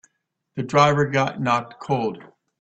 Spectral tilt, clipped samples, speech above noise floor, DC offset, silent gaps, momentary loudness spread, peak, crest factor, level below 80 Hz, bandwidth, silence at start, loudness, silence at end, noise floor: -6 dB/octave; under 0.1%; 52 dB; under 0.1%; none; 15 LU; -4 dBFS; 20 dB; -58 dBFS; 8.2 kHz; 0.55 s; -21 LUFS; 0.35 s; -73 dBFS